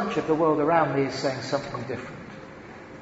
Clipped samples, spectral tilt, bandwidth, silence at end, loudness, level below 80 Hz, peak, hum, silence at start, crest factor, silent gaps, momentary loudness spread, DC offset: under 0.1%; -6 dB/octave; 8 kHz; 0 s; -25 LUFS; -58 dBFS; -8 dBFS; none; 0 s; 18 dB; none; 21 LU; under 0.1%